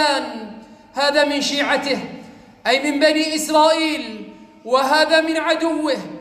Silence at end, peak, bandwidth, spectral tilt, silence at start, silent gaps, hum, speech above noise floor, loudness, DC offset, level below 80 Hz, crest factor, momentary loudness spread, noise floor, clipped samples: 0 s; -4 dBFS; 15.5 kHz; -2.5 dB/octave; 0 s; none; none; 22 dB; -18 LUFS; under 0.1%; -60 dBFS; 16 dB; 18 LU; -39 dBFS; under 0.1%